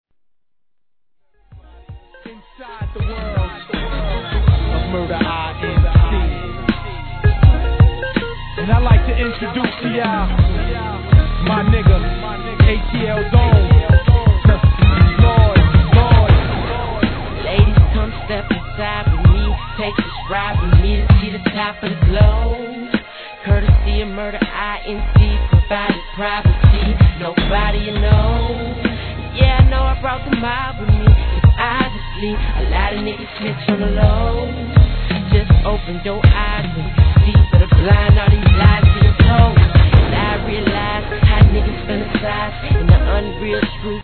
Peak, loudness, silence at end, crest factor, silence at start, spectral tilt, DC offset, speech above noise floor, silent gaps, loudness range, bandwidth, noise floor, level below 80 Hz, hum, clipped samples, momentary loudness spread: 0 dBFS; -15 LUFS; 0 s; 14 dB; 1.55 s; -10.5 dB/octave; 0.2%; 67 dB; none; 6 LU; 4.5 kHz; -81 dBFS; -18 dBFS; none; under 0.1%; 11 LU